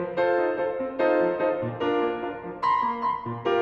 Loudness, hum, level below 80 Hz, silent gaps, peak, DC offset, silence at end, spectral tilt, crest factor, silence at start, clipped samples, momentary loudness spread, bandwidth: -26 LUFS; none; -62 dBFS; none; -10 dBFS; under 0.1%; 0 s; -7.5 dB/octave; 16 dB; 0 s; under 0.1%; 6 LU; 6.6 kHz